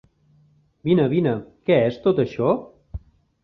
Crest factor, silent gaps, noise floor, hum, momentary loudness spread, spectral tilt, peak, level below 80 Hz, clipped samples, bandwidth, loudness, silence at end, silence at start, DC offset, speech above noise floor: 18 dB; none; -58 dBFS; none; 21 LU; -9.5 dB/octave; -4 dBFS; -48 dBFS; under 0.1%; 6.2 kHz; -21 LUFS; 0.45 s; 0.85 s; under 0.1%; 39 dB